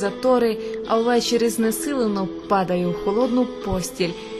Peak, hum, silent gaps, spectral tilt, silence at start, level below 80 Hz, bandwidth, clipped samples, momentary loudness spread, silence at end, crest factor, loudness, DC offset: -6 dBFS; none; none; -5 dB/octave; 0 s; -46 dBFS; 13.5 kHz; under 0.1%; 7 LU; 0 s; 14 dB; -21 LUFS; under 0.1%